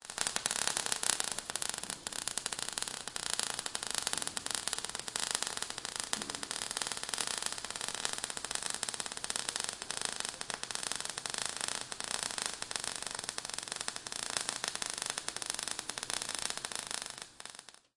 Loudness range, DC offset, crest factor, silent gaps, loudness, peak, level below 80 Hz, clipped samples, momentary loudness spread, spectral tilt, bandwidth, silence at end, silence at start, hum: 2 LU; under 0.1%; 36 dB; none; -36 LUFS; -4 dBFS; -68 dBFS; under 0.1%; 5 LU; 0.5 dB/octave; 11.5 kHz; 0.2 s; 0 s; none